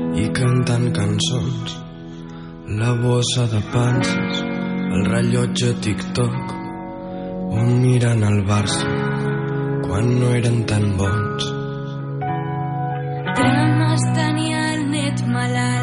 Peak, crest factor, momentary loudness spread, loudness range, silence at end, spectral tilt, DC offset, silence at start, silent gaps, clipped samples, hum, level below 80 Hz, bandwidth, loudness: -6 dBFS; 14 dB; 11 LU; 2 LU; 0 s; -6 dB/octave; under 0.1%; 0 s; none; under 0.1%; none; -44 dBFS; 11 kHz; -20 LUFS